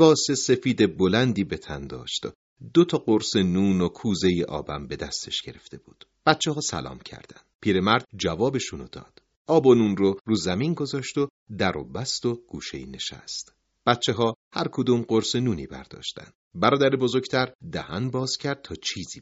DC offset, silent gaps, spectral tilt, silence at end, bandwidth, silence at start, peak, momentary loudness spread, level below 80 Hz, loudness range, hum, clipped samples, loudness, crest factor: under 0.1%; 2.35-2.56 s, 7.54-7.59 s, 9.37-9.45 s, 10.21-10.25 s, 11.30-11.46 s, 14.36-14.51 s, 16.35-16.51 s, 17.55-17.59 s; -4.5 dB/octave; 0 s; 8 kHz; 0 s; -2 dBFS; 14 LU; -56 dBFS; 4 LU; none; under 0.1%; -25 LUFS; 22 dB